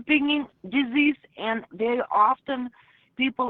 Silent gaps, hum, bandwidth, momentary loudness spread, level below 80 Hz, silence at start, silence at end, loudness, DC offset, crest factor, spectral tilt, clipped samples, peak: none; none; 4.3 kHz; 10 LU; -66 dBFS; 0 s; 0 s; -25 LUFS; under 0.1%; 18 dB; -7.5 dB/octave; under 0.1%; -8 dBFS